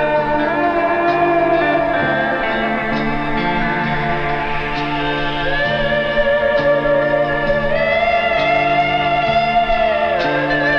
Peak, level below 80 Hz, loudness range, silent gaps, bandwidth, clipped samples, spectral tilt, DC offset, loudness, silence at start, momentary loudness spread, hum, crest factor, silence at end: -4 dBFS; -32 dBFS; 3 LU; none; 7.2 kHz; under 0.1%; -6.5 dB/octave; under 0.1%; -16 LUFS; 0 s; 4 LU; none; 12 dB; 0 s